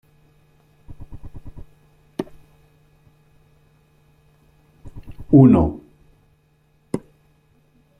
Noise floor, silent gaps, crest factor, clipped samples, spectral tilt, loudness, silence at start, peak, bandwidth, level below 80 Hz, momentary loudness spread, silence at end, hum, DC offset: -60 dBFS; none; 22 dB; under 0.1%; -10.5 dB/octave; -17 LUFS; 0.9 s; -2 dBFS; 10.5 kHz; -44 dBFS; 30 LU; 1 s; none; under 0.1%